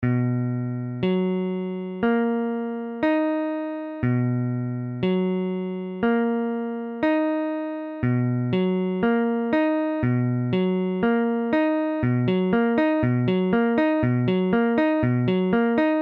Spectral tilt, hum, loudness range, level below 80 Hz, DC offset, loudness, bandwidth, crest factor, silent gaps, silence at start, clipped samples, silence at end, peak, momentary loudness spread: -10.5 dB/octave; none; 4 LU; -54 dBFS; under 0.1%; -23 LUFS; 5.4 kHz; 14 dB; none; 0 s; under 0.1%; 0 s; -8 dBFS; 7 LU